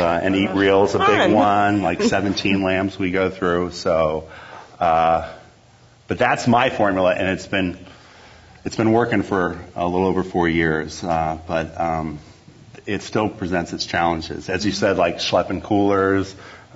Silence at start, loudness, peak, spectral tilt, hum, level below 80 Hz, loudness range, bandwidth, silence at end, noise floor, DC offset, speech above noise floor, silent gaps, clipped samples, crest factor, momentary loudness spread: 0 s; -20 LUFS; -2 dBFS; -5.5 dB/octave; none; -46 dBFS; 6 LU; 8 kHz; 0.15 s; -51 dBFS; under 0.1%; 31 dB; none; under 0.1%; 18 dB; 12 LU